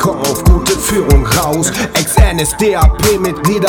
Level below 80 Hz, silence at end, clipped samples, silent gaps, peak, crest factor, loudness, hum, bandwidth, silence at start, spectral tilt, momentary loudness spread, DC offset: -16 dBFS; 0 s; 1%; none; 0 dBFS; 10 dB; -12 LUFS; none; over 20 kHz; 0 s; -4.5 dB/octave; 3 LU; under 0.1%